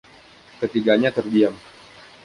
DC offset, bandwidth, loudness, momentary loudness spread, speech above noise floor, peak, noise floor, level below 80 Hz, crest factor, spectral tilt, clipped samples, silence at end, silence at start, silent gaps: under 0.1%; 11 kHz; -20 LUFS; 10 LU; 29 dB; -4 dBFS; -48 dBFS; -62 dBFS; 18 dB; -6.5 dB/octave; under 0.1%; 0.65 s; 0.6 s; none